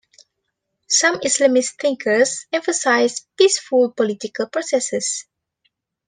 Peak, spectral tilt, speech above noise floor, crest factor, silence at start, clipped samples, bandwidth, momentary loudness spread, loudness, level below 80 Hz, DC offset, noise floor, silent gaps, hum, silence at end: -2 dBFS; -1.5 dB/octave; 58 dB; 18 dB; 0.9 s; under 0.1%; 10 kHz; 8 LU; -18 LUFS; -70 dBFS; under 0.1%; -76 dBFS; none; none; 0.85 s